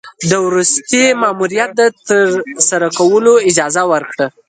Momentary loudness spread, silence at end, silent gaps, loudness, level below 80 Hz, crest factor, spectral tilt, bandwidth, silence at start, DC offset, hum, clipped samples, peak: 6 LU; 0.2 s; none; -12 LUFS; -58 dBFS; 12 dB; -3 dB/octave; 9.6 kHz; 0.05 s; under 0.1%; none; under 0.1%; 0 dBFS